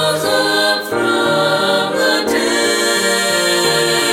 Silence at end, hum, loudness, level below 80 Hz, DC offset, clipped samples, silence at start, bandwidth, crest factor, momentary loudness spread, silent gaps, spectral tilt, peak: 0 s; none; -14 LUFS; -56 dBFS; under 0.1%; under 0.1%; 0 s; 18 kHz; 12 dB; 2 LU; none; -2 dB/octave; -2 dBFS